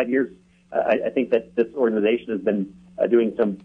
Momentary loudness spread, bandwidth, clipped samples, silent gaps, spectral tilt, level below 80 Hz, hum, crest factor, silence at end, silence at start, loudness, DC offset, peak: 7 LU; 4.9 kHz; under 0.1%; none; -8.5 dB/octave; -62 dBFS; none; 16 dB; 0.05 s; 0 s; -22 LUFS; under 0.1%; -6 dBFS